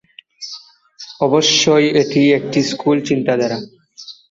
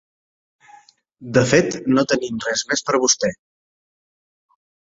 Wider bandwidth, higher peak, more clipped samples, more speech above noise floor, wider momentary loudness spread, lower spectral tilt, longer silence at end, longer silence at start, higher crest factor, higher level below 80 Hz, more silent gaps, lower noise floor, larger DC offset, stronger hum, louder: about the same, 7.8 kHz vs 8 kHz; about the same, -2 dBFS vs -2 dBFS; neither; second, 26 dB vs 32 dB; first, 24 LU vs 6 LU; about the same, -4 dB/octave vs -3.5 dB/octave; second, 0.2 s vs 1.55 s; second, 0.4 s vs 1.2 s; second, 14 dB vs 20 dB; about the same, -58 dBFS vs -56 dBFS; neither; second, -40 dBFS vs -51 dBFS; neither; neither; first, -15 LUFS vs -19 LUFS